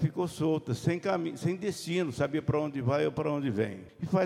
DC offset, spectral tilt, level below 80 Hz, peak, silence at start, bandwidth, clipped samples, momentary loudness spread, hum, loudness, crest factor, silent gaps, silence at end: under 0.1%; -7 dB/octave; -60 dBFS; -14 dBFS; 0 s; 14.5 kHz; under 0.1%; 4 LU; none; -31 LUFS; 16 dB; none; 0 s